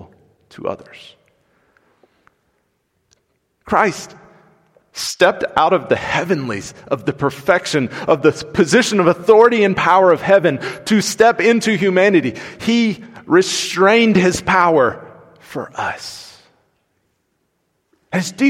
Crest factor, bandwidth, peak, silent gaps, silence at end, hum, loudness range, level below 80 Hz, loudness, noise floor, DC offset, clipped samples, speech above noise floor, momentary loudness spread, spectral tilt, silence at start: 16 dB; 16 kHz; 0 dBFS; none; 0 s; none; 12 LU; -52 dBFS; -15 LUFS; -68 dBFS; under 0.1%; under 0.1%; 53 dB; 16 LU; -4.5 dB/octave; 0.6 s